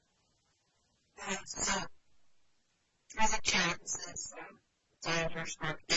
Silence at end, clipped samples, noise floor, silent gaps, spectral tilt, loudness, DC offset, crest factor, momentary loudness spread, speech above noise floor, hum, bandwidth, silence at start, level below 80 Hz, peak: 0 s; under 0.1%; -76 dBFS; none; -1.5 dB/octave; -34 LUFS; under 0.1%; 22 dB; 17 LU; 40 dB; none; 8.2 kHz; 1.2 s; -54 dBFS; -16 dBFS